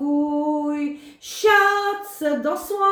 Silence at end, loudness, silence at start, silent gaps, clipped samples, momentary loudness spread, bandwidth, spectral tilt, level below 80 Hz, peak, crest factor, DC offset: 0 s; -21 LUFS; 0 s; none; under 0.1%; 13 LU; over 20 kHz; -2.5 dB/octave; -64 dBFS; -4 dBFS; 16 dB; under 0.1%